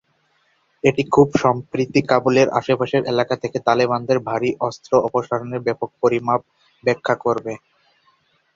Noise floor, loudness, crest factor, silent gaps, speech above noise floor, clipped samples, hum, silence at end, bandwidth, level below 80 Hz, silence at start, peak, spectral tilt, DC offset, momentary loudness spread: -64 dBFS; -19 LUFS; 18 dB; none; 45 dB; under 0.1%; none; 1 s; 7.6 kHz; -56 dBFS; 0.85 s; -2 dBFS; -6 dB/octave; under 0.1%; 8 LU